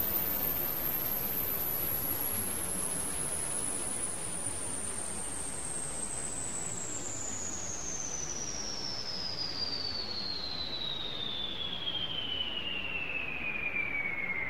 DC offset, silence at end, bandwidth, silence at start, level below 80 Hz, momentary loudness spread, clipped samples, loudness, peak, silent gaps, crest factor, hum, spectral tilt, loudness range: 0.9%; 0 s; 16 kHz; 0 s; -54 dBFS; 5 LU; under 0.1%; -33 LUFS; -20 dBFS; none; 16 dB; none; -1 dB/octave; 4 LU